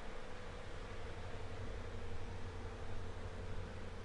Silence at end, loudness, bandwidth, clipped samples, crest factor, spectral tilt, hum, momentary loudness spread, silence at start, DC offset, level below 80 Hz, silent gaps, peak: 0 s; -49 LUFS; 10.5 kHz; under 0.1%; 12 dB; -6 dB/octave; none; 2 LU; 0 s; under 0.1%; -50 dBFS; none; -32 dBFS